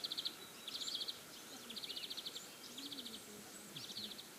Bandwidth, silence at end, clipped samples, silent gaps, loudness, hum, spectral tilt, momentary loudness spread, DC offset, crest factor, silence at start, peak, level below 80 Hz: 15.5 kHz; 0 s; under 0.1%; none; -46 LUFS; none; -1 dB/octave; 10 LU; under 0.1%; 20 dB; 0 s; -30 dBFS; -84 dBFS